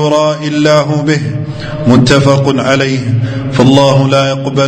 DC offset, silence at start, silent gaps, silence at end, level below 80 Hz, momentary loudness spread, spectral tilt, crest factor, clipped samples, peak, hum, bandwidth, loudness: under 0.1%; 0 s; none; 0 s; -36 dBFS; 8 LU; -6 dB/octave; 10 dB; 1%; 0 dBFS; none; 9.2 kHz; -10 LUFS